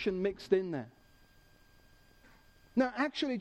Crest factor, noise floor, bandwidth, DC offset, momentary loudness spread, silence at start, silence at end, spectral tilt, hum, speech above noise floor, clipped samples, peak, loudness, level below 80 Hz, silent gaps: 22 dB; -63 dBFS; 12 kHz; under 0.1%; 10 LU; 0 s; 0 s; -6 dB/octave; none; 30 dB; under 0.1%; -14 dBFS; -34 LUFS; -64 dBFS; none